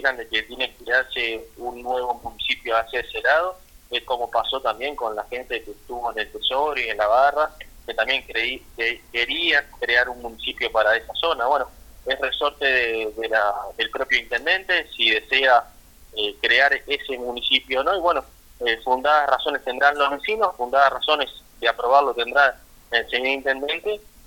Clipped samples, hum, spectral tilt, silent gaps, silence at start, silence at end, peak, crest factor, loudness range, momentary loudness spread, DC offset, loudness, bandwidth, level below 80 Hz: under 0.1%; none; -2 dB/octave; none; 0 s; 0.25 s; -2 dBFS; 22 dB; 4 LU; 10 LU; under 0.1%; -21 LUFS; 18 kHz; -50 dBFS